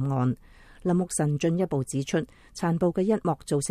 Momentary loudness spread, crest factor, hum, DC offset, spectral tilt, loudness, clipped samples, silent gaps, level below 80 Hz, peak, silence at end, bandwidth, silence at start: 6 LU; 14 dB; none; under 0.1%; -6.5 dB/octave; -27 LUFS; under 0.1%; none; -54 dBFS; -12 dBFS; 0 s; 14 kHz; 0 s